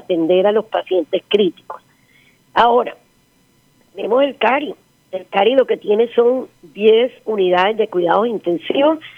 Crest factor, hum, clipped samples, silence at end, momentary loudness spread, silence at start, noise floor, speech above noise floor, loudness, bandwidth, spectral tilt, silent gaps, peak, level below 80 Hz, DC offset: 16 dB; none; under 0.1%; 0.05 s; 14 LU; 0.1 s; -56 dBFS; 41 dB; -16 LUFS; 6.4 kHz; -6.5 dB/octave; none; 0 dBFS; -60 dBFS; under 0.1%